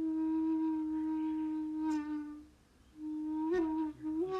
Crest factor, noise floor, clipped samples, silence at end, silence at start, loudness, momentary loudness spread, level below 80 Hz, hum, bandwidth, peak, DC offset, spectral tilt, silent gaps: 12 dB; -63 dBFS; under 0.1%; 0 s; 0 s; -36 LUFS; 9 LU; -66 dBFS; none; 7.6 kHz; -24 dBFS; under 0.1%; -7 dB/octave; none